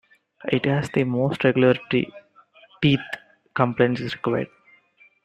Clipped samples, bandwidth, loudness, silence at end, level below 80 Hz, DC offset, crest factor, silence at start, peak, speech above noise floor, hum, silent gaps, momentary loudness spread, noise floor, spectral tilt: under 0.1%; 10.5 kHz; -22 LUFS; 0.8 s; -58 dBFS; under 0.1%; 22 dB; 0.45 s; -2 dBFS; 36 dB; none; none; 14 LU; -57 dBFS; -7.5 dB/octave